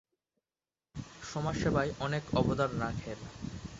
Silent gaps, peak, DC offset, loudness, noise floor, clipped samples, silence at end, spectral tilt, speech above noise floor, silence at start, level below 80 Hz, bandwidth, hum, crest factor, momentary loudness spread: none; -14 dBFS; under 0.1%; -34 LUFS; under -90 dBFS; under 0.1%; 0 s; -6 dB/octave; over 57 dB; 0.95 s; -50 dBFS; 8 kHz; none; 20 dB; 14 LU